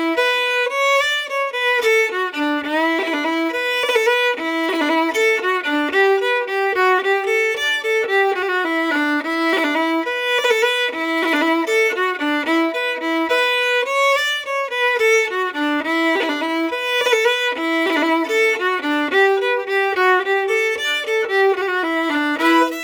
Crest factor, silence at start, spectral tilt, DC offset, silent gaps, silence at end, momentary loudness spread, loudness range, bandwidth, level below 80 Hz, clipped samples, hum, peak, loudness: 14 dB; 0 s; -1 dB/octave; under 0.1%; none; 0 s; 4 LU; 1 LU; over 20 kHz; -68 dBFS; under 0.1%; none; -4 dBFS; -17 LUFS